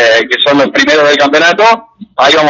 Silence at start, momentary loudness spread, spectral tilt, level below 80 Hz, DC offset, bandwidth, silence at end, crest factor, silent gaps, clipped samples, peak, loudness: 0 s; 4 LU; -3 dB/octave; -52 dBFS; under 0.1%; 7.8 kHz; 0 s; 8 dB; none; under 0.1%; 0 dBFS; -7 LUFS